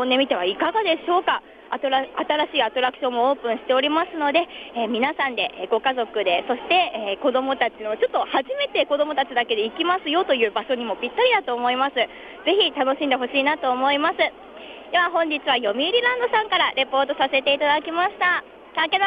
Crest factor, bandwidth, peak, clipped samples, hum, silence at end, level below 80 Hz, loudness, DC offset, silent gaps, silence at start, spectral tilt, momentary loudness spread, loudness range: 16 dB; 5.2 kHz; -6 dBFS; under 0.1%; none; 0 s; -64 dBFS; -21 LUFS; under 0.1%; none; 0 s; -5 dB/octave; 6 LU; 2 LU